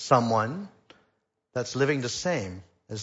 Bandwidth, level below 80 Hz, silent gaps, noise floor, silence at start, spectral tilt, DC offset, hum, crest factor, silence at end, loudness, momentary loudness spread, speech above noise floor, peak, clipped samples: 8 kHz; -64 dBFS; none; -74 dBFS; 0 s; -5 dB/octave; under 0.1%; none; 22 dB; 0 s; -27 LUFS; 17 LU; 48 dB; -6 dBFS; under 0.1%